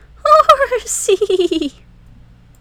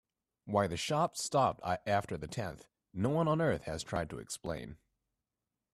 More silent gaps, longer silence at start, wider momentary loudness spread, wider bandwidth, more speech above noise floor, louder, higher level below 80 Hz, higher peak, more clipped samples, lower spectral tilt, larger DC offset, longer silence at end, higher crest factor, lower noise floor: neither; second, 0.25 s vs 0.45 s; about the same, 10 LU vs 12 LU; first, over 20 kHz vs 14.5 kHz; second, 27 dB vs 56 dB; first, -13 LUFS vs -34 LUFS; first, -44 dBFS vs -60 dBFS; first, 0 dBFS vs -16 dBFS; first, 0.5% vs under 0.1%; second, -2 dB/octave vs -5 dB/octave; neither; about the same, 0.9 s vs 1 s; about the same, 16 dB vs 20 dB; second, -43 dBFS vs -90 dBFS